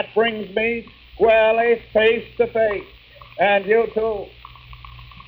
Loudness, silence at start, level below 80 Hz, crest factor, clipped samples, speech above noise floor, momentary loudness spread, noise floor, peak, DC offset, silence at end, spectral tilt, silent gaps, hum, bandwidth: -19 LUFS; 0 s; -48 dBFS; 16 dB; under 0.1%; 22 dB; 14 LU; -41 dBFS; -6 dBFS; under 0.1%; 0.2 s; -7.5 dB/octave; none; none; 5 kHz